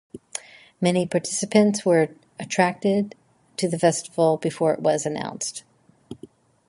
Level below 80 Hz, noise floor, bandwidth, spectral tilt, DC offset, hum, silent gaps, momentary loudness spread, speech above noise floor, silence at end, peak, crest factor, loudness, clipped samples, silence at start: -66 dBFS; -48 dBFS; 11.5 kHz; -5 dB/octave; under 0.1%; none; none; 18 LU; 27 dB; 0.55 s; -4 dBFS; 20 dB; -23 LUFS; under 0.1%; 0.15 s